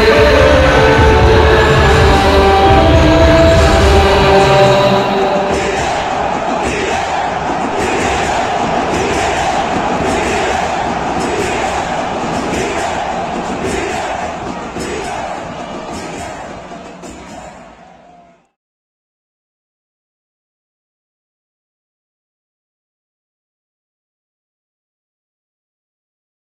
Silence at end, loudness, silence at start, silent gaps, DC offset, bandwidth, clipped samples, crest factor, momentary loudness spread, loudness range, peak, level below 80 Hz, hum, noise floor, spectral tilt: 8.7 s; -12 LUFS; 0 s; none; under 0.1%; 13.5 kHz; under 0.1%; 14 dB; 16 LU; 16 LU; 0 dBFS; -24 dBFS; none; -44 dBFS; -5 dB/octave